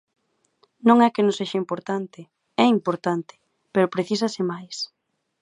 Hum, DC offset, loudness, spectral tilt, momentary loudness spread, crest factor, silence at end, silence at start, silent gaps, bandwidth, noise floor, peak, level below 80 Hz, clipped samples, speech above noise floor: none; under 0.1%; -23 LUFS; -5.5 dB/octave; 15 LU; 22 dB; 0.55 s; 0.85 s; none; 10.5 kHz; -65 dBFS; -2 dBFS; -74 dBFS; under 0.1%; 43 dB